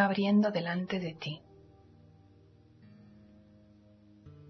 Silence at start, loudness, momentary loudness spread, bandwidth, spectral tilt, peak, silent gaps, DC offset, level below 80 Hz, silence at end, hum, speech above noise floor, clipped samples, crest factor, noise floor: 0 s; -31 LUFS; 14 LU; 6.2 kHz; -7.5 dB/octave; -12 dBFS; none; under 0.1%; -70 dBFS; 0.2 s; none; 30 dB; under 0.1%; 22 dB; -60 dBFS